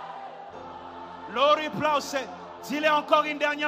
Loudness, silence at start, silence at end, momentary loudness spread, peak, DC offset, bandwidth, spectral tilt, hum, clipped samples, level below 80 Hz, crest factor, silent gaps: -25 LUFS; 0 s; 0 s; 19 LU; -6 dBFS; under 0.1%; 15.5 kHz; -3.5 dB/octave; none; under 0.1%; -70 dBFS; 20 dB; none